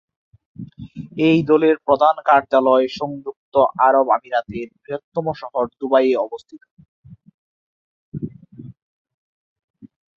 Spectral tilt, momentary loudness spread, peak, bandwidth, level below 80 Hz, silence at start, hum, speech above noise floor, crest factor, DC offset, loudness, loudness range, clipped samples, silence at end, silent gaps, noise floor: -7.5 dB/octave; 20 LU; -2 dBFS; 7.2 kHz; -58 dBFS; 0.6 s; none; 22 dB; 18 dB; under 0.1%; -18 LUFS; 23 LU; under 0.1%; 0.3 s; 3.36-3.52 s, 5.04-5.12 s, 6.71-6.77 s, 6.88-7.03 s, 7.34-8.12 s, 8.82-9.05 s, 9.14-9.56 s, 9.64-9.74 s; -40 dBFS